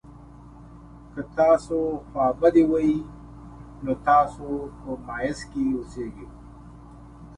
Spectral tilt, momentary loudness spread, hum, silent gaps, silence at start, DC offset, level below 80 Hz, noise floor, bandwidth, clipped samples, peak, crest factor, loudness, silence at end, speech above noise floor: -7 dB/octave; 23 LU; none; none; 0.1 s; under 0.1%; -46 dBFS; -45 dBFS; 10.5 kHz; under 0.1%; -6 dBFS; 18 dB; -24 LUFS; 0 s; 22 dB